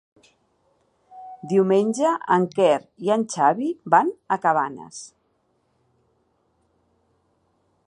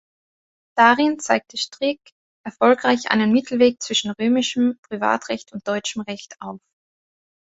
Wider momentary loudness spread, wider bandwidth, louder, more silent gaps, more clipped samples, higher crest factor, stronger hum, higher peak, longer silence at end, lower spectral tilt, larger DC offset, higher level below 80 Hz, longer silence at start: first, 20 LU vs 16 LU; first, 11 kHz vs 8 kHz; about the same, -21 LUFS vs -20 LUFS; second, none vs 2.12-2.44 s, 4.78-4.83 s; neither; about the same, 22 dB vs 22 dB; neither; about the same, -2 dBFS vs 0 dBFS; first, 2.8 s vs 1 s; first, -5.5 dB/octave vs -3.5 dB/octave; neither; second, -74 dBFS vs -64 dBFS; first, 1.15 s vs 0.75 s